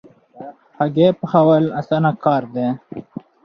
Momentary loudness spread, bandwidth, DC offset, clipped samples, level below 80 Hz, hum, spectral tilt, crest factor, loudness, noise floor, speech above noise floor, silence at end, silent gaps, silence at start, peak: 23 LU; 6.2 kHz; under 0.1%; under 0.1%; -60 dBFS; none; -9.5 dB/octave; 16 dB; -17 LUFS; -38 dBFS; 21 dB; 0.45 s; none; 0.35 s; -2 dBFS